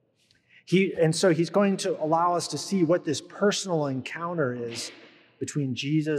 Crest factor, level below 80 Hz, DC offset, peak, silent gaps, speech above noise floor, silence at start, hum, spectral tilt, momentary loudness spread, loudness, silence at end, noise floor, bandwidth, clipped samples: 16 dB; -76 dBFS; under 0.1%; -10 dBFS; none; 41 dB; 0.7 s; none; -5 dB/octave; 10 LU; -26 LUFS; 0 s; -66 dBFS; 14 kHz; under 0.1%